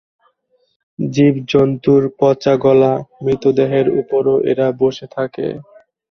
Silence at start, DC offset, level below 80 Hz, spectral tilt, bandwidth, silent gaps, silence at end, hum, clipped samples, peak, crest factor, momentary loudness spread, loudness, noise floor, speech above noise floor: 1 s; under 0.1%; -52 dBFS; -8 dB/octave; 6.4 kHz; none; 0.5 s; none; under 0.1%; 0 dBFS; 14 dB; 11 LU; -15 LUFS; -62 dBFS; 47 dB